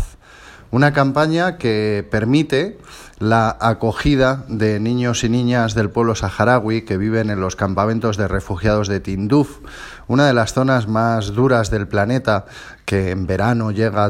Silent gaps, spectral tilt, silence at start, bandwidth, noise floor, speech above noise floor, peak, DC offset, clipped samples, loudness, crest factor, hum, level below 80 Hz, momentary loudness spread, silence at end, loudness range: none; -6.5 dB/octave; 0 s; 13 kHz; -42 dBFS; 25 dB; 0 dBFS; under 0.1%; under 0.1%; -18 LUFS; 18 dB; none; -38 dBFS; 6 LU; 0 s; 1 LU